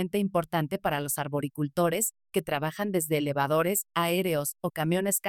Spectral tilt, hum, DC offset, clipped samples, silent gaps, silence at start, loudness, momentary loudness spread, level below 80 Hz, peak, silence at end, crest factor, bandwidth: -4.5 dB/octave; none; under 0.1%; under 0.1%; none; 0 s; -28 LUFS; 5 LU; -64 dBFS; -12 dBFS; 0 s; 16 dB; 19.5 kHz